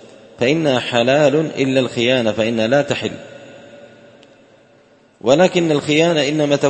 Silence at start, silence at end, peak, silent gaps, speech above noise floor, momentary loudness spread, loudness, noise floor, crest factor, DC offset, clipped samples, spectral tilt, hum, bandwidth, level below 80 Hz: 0.4 s; 0 s; 0 dBFS; none; 36 dB; 8 LU; -16 LUFS; -51 dBFS; 18 dB; under 0.1%; under 0.1%; -5 dB/octave; none; 8.8 kHz; -56 dBFS